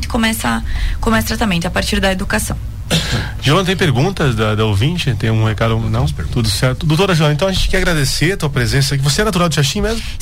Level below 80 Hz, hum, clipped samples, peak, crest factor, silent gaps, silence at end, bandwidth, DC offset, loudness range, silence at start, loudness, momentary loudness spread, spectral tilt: -24 dBFS; none; under 0.1%; -4 dBFS; 12 dB; none; 0 s; 16.5 kHz; 2%; 2 LU; 0 s; -15 LUFS; 5 LU; -5 dB/octave